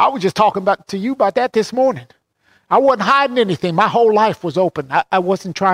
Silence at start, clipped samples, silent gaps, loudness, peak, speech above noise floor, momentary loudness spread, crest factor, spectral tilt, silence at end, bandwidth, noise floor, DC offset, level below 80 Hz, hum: 0 s; under 0.1%; none; -16 LUFS; -2 dBFS; 43 dB; 6 LU; 14 dB; -5.5 dB/octave; 0 s; 14 kHz; -58 dBFS; under 0.1%; -60 dBFS; none